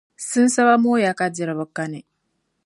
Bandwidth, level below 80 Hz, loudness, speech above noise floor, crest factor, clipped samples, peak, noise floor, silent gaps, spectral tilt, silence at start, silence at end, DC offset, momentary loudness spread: 11.5 kHz; -72 dBFS; -19 LUFS; 53 dB; 18 dB; under 0.1%; -2 dBFS; -72 dBFS; none; -4.5 dB/octave; 0.2 s; 0.65 s; under 0.1%; 14 LU